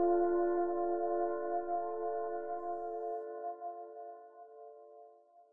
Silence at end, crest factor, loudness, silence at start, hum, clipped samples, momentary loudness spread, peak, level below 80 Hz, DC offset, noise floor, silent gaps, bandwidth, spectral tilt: 0 s; 16 dB; -36 LUFS; 0 s; none; under 0.1%; 22 LU; -20 dBFS; -68 dBFS; under 0.1%; -61 dBFS; none; 2.2 kHz; -10 dB/octave